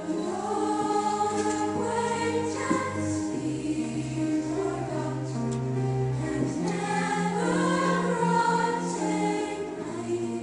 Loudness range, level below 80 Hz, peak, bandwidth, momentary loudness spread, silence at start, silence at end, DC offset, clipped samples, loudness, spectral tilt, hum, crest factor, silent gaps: 3 LU; -58 dBFS; -12 dBFS; 10.5 kHz; 6 LU; 0 s; 0 s; under 0.1%; under 0.1%; -28 LUFS; -5.5 dB/octave; none; 16 dB; none